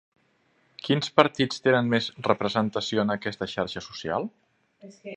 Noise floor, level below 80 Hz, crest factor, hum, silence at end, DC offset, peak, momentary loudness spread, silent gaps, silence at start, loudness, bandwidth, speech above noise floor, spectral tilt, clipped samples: -67 dBFS; -62 dBFS; 26 dB; none; 0 s; under 0.1%; 0 dBFS; 11 LU; none; 0.85 s; -26 LUFS; 9.6 kHz; 41 dB; -5.5 dB/octave; under 0.1%